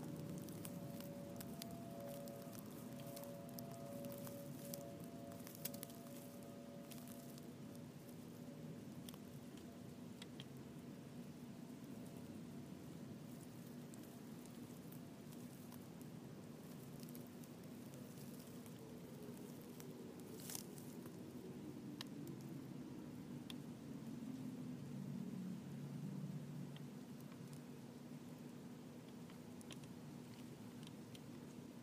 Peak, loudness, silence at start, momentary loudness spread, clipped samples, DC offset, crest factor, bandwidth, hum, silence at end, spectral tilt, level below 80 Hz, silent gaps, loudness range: -26 dBFS; -53 LUFS; 0 s; 6 LU; under 0.1%; under 0.1%; 26 dB; 15.5 kHz; none; 0 s; -5.5 dB/octave; -80 dBFS; none; 4 LU